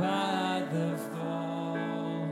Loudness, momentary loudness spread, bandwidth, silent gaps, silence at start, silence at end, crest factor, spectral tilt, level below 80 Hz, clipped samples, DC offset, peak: -32 LUFS; 5 LU; 15.5 kHz; none; 0 s; 0 s; 14 dB; -6 dB/octave; -80 dBFS; under 0.1%; under 0.1%; -18 dBFS